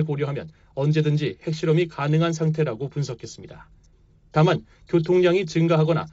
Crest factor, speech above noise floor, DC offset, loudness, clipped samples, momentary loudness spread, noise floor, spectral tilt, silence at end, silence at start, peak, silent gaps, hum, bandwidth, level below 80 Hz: 14 dB; 33 dB; under 0.1%; -22 LUFS; under 0.1%; 12 LU; -55 dBFS; -7 dB/octave; 0.05 s; 0 s; -8 dBFS; none; none; 7.8 kHz; -56 dBFS